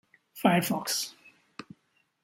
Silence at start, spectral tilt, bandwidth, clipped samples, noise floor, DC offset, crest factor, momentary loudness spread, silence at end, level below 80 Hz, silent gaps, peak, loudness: 0.35 s; -4 dB/octave; 17 kHz; under 0.1%; -71 dBFS; under 0.1%; 24 dB; 23 LU; 0.6 s; -74 dBFS; none; -8 dBFS; -28 LUFS